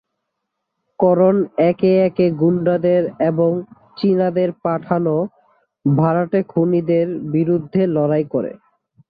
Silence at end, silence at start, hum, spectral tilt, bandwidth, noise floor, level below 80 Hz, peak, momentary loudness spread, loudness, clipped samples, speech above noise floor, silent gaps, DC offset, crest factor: 0.55 s; 1 s; none; -12 dB/octave; 5 kHz; -77 dBFS; -60 dBFS; -2 dBFS; 8 LU; -17 LUFS; under 0.1%; 60 dB; none; under 0.1%; 14 dB